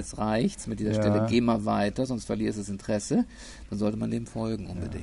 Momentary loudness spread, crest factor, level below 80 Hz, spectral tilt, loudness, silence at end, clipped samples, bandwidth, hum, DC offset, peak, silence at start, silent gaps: 10 LU; 16 dB; -46 dBFS; -6 dB/octave; -28 LUFS; 0 s; under 0.1%; 11.5 kHz; none; under 0.1%; -12 dBFS; 0 s; none